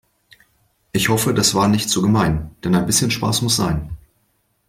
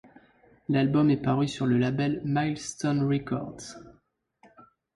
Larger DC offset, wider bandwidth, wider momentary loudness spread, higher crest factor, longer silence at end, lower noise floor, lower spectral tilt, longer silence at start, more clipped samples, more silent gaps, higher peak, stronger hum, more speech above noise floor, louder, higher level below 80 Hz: neither; first, 16.5 kHz vs 11.5 kHz; second, 10 LU vs 18 LU; about the same, 18 dB vs 14 dB; first, 0.7 s vs 0.35 s; about the same, -65 dBFS vs -67 dBFS; second, -4 dB/octave vs -6.5 dB/octave; first, 0.95 s vs 0.7 s; neither; neither; first, -2 dBFS vs -14 dBFS; neither; first, 48 dB vs 41 dB; first, -18 LUFS vs -27 LUFS; first, -40 dBFS vs -60 dBFS